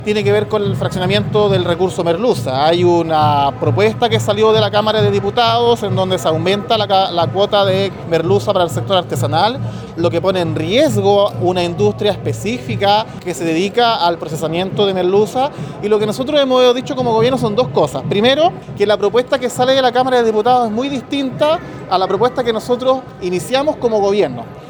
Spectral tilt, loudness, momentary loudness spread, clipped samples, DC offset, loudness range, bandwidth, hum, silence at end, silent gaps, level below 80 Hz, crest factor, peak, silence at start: -5.5 dB/octave; -15 LUFS; 6 LU; under 0.1%; under 0.1%; 2 LU; over 20 kHz; none; 0 s; none; -46 dBFS; 14 dB; 0 dBFS; 0 s